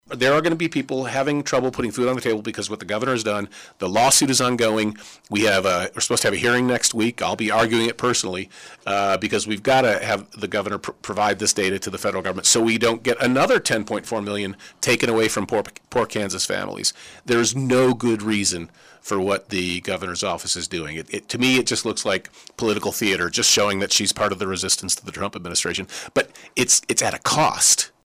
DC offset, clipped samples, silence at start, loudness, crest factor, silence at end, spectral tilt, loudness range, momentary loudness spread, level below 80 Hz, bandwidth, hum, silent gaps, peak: under 0.1%; under 0.1%; 0.1 s; -20 LUFS; 14 dB; 0.15 s; -2.5 dB/octave; 3 LU; 11 LU; -56 dBFS; 16 kHz; none; none; -8 dBFS